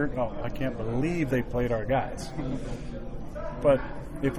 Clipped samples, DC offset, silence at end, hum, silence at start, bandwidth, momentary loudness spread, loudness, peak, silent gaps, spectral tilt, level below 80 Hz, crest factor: under 0.1%; under 0.1%; 0 s; none; 0 s; 14.5 kHz; 14 LU; -30 LUFS; -10 dBFS; none; -7.5 dB/octave; -38 dBFS; 18 dB